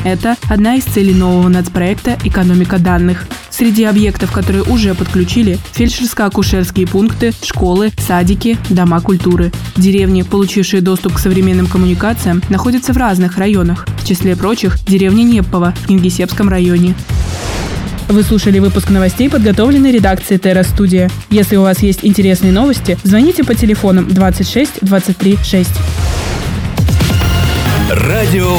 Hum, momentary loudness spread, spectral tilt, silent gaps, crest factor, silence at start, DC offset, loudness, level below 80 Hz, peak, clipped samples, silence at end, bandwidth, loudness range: none; 5 LU; -6 dB/octave; none; 10 dB; 0 s; under 0.1%; -11 LUFS; -22 dBFS; 0 dBFS; under 0.1%; 0 s; over 20 kHz; 3 LU